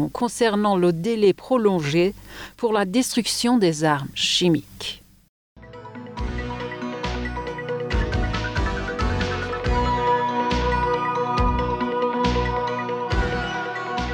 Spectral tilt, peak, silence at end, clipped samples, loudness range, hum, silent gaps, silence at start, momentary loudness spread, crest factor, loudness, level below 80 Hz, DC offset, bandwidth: -5 dB/octave; -6 dBFS; 0 s; under 0.1%; 7 LU; none; 5.29-5.56 s; 0 s; 11 LU; 16 dB; -23 LUFS; -32 dBFS; under 0.1%; over 20 kHz